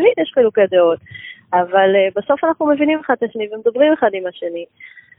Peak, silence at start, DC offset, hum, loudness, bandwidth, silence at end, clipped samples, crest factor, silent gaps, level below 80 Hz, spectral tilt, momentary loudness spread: 0 dBFS; 0 s; under 0.1%; none; -16 LUFS; 3.8 kHz; 0.2 s; under 0.1%; 16 dB; none; -62 dBFS; -10.5 dB/octave; 13 LU